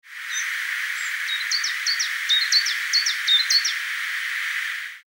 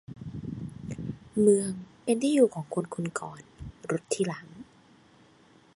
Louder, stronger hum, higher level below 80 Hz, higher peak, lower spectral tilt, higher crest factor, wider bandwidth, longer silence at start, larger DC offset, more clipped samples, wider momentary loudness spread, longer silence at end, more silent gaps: first, -21 LUFS vs -29 LUFS; neither; second, under -90 dBFS vs -58 dBFS; first, -6 dBFS vs -10 dBFS; second, 12.5 dB/octave vs -6 dB/octave; about the same, 18 dB vs 20 dB; first, over 20 kHz vs 11.5 kHz; about the same, 0.05 s vs 0.1 s; neither; neither; second, 8 LU vs 20 LU; second, 0.1 s vs 1.1 s; neither